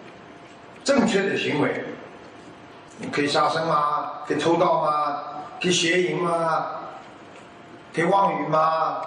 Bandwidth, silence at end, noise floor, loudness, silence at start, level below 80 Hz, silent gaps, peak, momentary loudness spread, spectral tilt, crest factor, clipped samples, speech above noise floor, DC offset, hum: 10 kHz; 0 s; -44 dBFS; -22 LUFS; 0 s; -66 dBFS; none; -6 dBFS; 22 LU; -4.5 dB/octave; 18 dB; under 0.1%; 22 dB; under 0.1%; none